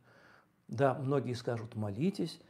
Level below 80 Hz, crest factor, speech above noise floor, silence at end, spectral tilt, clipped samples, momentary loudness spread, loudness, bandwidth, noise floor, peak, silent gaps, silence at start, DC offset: -78 dBFS; 20 dB; 30 dB; 0.1 s; -7.5 dB/octave; under 0.1%; 8 LU; -34 LUFS; 13.5 kHz; -64 dBFS; -14 dBFS; none; 0.7 s; under 0.1%